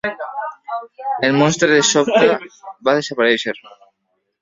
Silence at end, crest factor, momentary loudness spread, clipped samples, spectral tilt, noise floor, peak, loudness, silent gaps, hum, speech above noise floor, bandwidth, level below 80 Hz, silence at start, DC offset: 0.85 s; 18 dB; 15 LU; under 0.1%; -3.5 dB/octave; -71 dBFS; 0 dBFS; -16 LUFS; none; none; 55 dB; 7.8 kHz; -60 dBFS; 0.05 s; under 0.1%